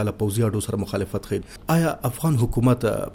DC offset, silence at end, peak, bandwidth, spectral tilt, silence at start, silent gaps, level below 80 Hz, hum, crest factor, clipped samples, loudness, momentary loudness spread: under 0.1%; 0 s; -6 dBFS; 17 kHz; -6.5 dB/octave; 0 s; none; -40 dBFS; none; 16 dB; under 0.1%; -23 LUFS; 7 LU